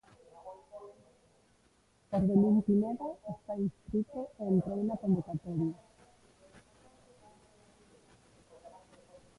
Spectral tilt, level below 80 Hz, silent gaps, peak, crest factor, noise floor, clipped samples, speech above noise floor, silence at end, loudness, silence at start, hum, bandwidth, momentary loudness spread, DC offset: -10.5 dB/octave; -62 dBFS; none; -14 dBFS; 20 dB; -69 dBFS; under 0.1%; 37 dB; 0.7 s; -32 LUFS; 0.35 s; none; 10.5 kHz; 25 LU; under 0.1%